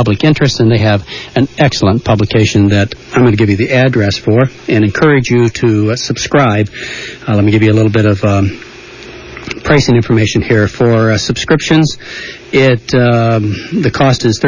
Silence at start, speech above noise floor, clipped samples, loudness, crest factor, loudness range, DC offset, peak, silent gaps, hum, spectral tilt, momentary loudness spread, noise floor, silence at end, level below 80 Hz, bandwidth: 0 s; 21 dB; under 0.1%; -11 LUFS; 10 dB; 2 LU; under 0.1%; 0 dBFS; none; none; -6 dB/octave; 12 LU; -31 dBFS; 0 s; -34 dBFS; 7.4 kHz